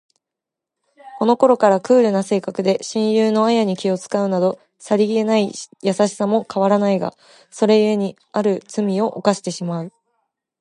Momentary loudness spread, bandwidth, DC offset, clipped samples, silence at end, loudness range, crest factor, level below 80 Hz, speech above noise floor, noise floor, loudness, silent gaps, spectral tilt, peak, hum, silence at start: 9 LU; 11.5 kHz; under 0.1%; under 0.1%; 0.7 s; 3 LU; 18 dB; -70 dBFS; 67 dB; -85 dBFS; -18 LUFS; none; -6 dB/octave; -2 dBFS; none; 1.05 s